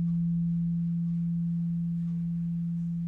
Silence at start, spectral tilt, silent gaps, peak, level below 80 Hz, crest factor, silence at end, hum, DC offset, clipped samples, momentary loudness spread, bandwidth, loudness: 0 s; -11.5 dB/octave; none; -24 dBFS; -54 dBFS; 6 dB; 0 s; none; under 0.1%; under 0.1%; 3 LU; 0.5 kHz; -30 LUFS